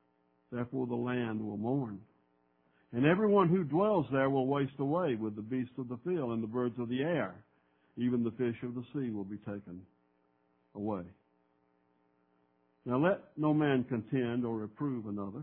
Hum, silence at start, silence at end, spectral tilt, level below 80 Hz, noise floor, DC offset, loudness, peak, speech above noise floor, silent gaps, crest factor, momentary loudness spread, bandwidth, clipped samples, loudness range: none; 0.5 s; 0 s; -7 dB/octave; -72 dBFS; -73 dBFS; under 0.1%; -33 LUFS; -12 dBFS; 41 dB; none; 22 dB; 13 LU; 4 kHz; under 0.1%; 12 LU